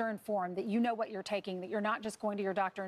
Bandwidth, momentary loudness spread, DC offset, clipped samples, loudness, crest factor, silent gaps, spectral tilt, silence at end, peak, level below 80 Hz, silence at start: 14 kHz; 5 LU; under 0.1%; under 0.1%; -36 LUFS; 16 dB; none; -5.5 dB/octave; 0 s; -20 dBFS; -78 dBFS; 0 s